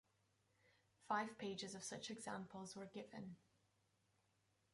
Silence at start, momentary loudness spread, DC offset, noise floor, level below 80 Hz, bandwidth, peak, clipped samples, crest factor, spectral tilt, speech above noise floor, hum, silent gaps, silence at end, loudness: 1 s; 11 LU; under 0.1%; -83 dBFS; -88 dBFS; 11.5 kHz; -28 dBFS; under 0.1%; 24 dB; -3.5 dB/octave; 33 dB; none; none; 1.35 s; -50 LUFS